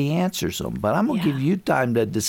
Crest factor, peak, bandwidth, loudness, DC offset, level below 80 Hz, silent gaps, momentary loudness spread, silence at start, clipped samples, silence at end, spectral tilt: 16 dB; -6 dBFS; 17 kHz; -22 LUFS; under 0.1%; -50 dBFS; none; 5 LU; 0 s; under 0.1%; 0 s; -5.5 dB/octave